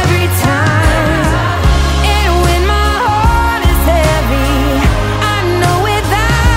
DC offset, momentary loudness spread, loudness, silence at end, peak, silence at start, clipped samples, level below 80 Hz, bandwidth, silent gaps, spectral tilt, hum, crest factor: under 0.1%; 2 LU; -12 LUFS; 0 s; 0 dBFS; 0 s; under 0.1%; -16 dBFS; 16.5 kHz; none; -5 dB/octave; none; 10 dB